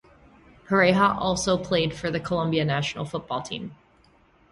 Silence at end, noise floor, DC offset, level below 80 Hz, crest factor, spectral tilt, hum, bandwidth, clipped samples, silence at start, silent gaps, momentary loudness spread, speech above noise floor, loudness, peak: 0.75 s; -59 dBFS; under 0.1%; -52 dBFS; 18 dB; -5 dB/octave; none; 11.5 kHz; under 0.1%; 0.7 s; none; 12 LU; 35 dB; -24 LUFS; -8 dBFS